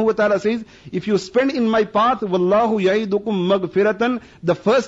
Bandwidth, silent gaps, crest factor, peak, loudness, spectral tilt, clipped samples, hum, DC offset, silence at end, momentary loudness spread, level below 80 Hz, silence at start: 8 kHz; none; 12 dB; -6 dBFS; -19 LUFS; -6.5 dB/octave; under 0.1%; none; under 0.1%; 0 s; 6 LU; -54 dBFS; 0 s